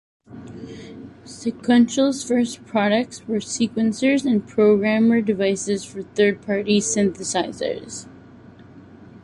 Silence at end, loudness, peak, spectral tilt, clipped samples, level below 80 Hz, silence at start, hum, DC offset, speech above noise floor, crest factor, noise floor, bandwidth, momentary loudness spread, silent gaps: 0.05 s; -20 LUFS; -6 dBFS; -4.5 dB/octave; under 0.1%; -58 dBFS; 0.3 s; none; under 0.1%; 25 dB; 16 dB; -45 dBFS; 11.5 kHz; 20 LU; none